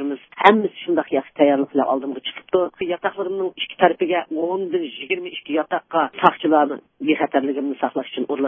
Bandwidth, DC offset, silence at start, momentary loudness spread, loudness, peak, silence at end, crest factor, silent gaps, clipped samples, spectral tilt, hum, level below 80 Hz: 7.2 kHz; under 0.1%; 0 s; 9 LU; -21 LUFS; 0 dBFS; 0 s; 20 dB; none; under 0.1%; -7 dB/octave; none; -70 dBFS